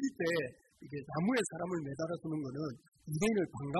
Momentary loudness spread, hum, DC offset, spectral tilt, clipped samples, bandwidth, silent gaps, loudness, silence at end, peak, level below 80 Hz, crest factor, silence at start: 11 LU; none; under 0.1%; -5.5 dB/octave; under 0.1%; 12 kHz; 2.88-2.92 s; -36 LUFS; 0 s; -20 dBFS; -66 dBFS; 16 dB; 0 s